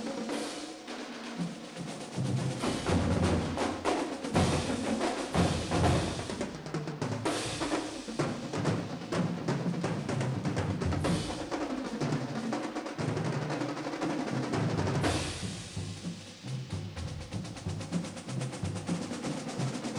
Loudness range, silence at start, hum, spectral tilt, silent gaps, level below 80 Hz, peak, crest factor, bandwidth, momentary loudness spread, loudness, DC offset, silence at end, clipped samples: 6 LU; 0 s; none; -5.5 dB/octave; none; -50 dBFS; -14 dBFS; 18 dB; 13.5 kHz; 10 LU; -33 LUFS; under 0.1%; 0 s; under 0.1%